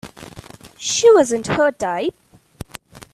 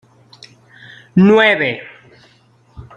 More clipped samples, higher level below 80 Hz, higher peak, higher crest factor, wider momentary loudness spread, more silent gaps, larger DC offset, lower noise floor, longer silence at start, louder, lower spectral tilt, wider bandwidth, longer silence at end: neither; about the same, -50 dBFS vs -52 dBFS; about the same, -2 dBFS vs -2 dBFS; about the same, 18 dB vs 16 dB; first, 26 LU vs 12 LU; neither; neither; second, -41 dBFS vs -52 dBFS; second, 0.05 s vs 1.15 s; second, -17 LUFS vs -12 LUFS; second, -3.5 dB/octave vs -7.5 dB/octave; first, 13.5 kHz vs 7 kHz; about the same, 0.15 s vs 0.15 s